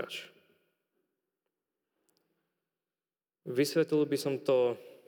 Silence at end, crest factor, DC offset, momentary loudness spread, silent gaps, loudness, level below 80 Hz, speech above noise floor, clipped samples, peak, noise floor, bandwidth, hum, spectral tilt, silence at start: 0.2 s; 20 dB; under 0.1%; 13 LU; none; -30 LUFS; under -90 dBFS; over 60 dB; under 0.1%; -16 dBFS; under -90 dBFS; over 20 kHz; none; -5 dB/octave; 0 s